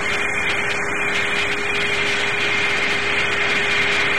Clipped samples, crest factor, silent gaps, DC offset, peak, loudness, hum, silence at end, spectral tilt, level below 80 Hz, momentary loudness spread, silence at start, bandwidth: under 0.1%; 12 dB; none; 4%; -8 dBFS; -18 LUFS; none; 0 s; -2 dB/octave; -46 dBFS; 3 LU; 0 s; 16.5 kHz